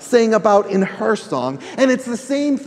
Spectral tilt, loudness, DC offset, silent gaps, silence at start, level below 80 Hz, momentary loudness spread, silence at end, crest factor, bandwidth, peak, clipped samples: -5.5 dB/octave; -17 LUFS; under 0.1%; none; 0 s; -66 dBFS; 9 LU; 0 s; 16 dB; 13.5 kHz; 0 dBFS; under 0.1%